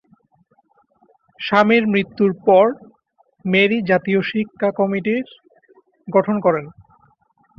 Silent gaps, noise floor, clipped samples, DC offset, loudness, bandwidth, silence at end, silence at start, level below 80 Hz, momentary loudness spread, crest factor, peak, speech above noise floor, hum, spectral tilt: none; -60 dBFS; under 0.1%; under 0.1%; -18 LUFS; 6.6 kHz; 0.85 s; 1.4 s; -62 dBFS; 11 LU; 18 dB; -2 dBFS; 43 dB; none; -8 dB/octave